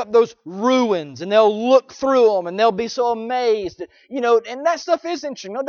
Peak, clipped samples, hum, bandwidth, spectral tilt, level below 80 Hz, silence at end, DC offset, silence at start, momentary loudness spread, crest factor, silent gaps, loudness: -2 dBFS; under 0.1%; none; 7 kHz; -4.5 dB/octave; -62 dBFS; 0 s; under 0.1%; 0 s; 10 LU; 16 dB; none; -19 LUFS